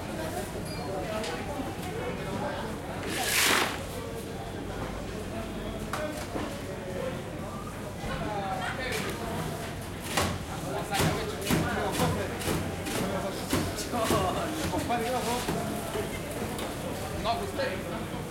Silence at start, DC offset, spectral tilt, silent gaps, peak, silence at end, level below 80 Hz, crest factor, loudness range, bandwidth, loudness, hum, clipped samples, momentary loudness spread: 0 s; under 0.1%; -4 dB/octave; none; -10 dBFS; 0 s; -46 dBFS; 22 dB; 6 LU; 16.5 kHz; -31 LUFS; none; under 0.1%; 9 LU